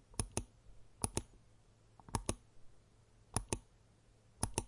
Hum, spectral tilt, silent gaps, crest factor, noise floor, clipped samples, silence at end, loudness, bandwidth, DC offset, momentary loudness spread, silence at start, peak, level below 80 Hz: none; -3.5 dB/octave; none; 30 dB; -67 dBFS; under 0.1%; 0 s; -43 LUFS; 11.5 kHz; under 0.1%; 16 LU; 0.1 s; -16 dBFS; -54 dBFS